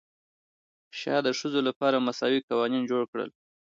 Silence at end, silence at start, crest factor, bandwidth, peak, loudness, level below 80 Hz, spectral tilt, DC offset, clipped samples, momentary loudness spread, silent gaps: 0.5 s; 0.95 s; 18 dB; 7.6 kHz; -12 dBFS; -28 LUFS; -78 dBFS; -4.5 dB/octave; under 0.1%; under 0.1%; 11 LU; 1.76-1.81 s, 2.43-2.48 s, 3.08-3.13 s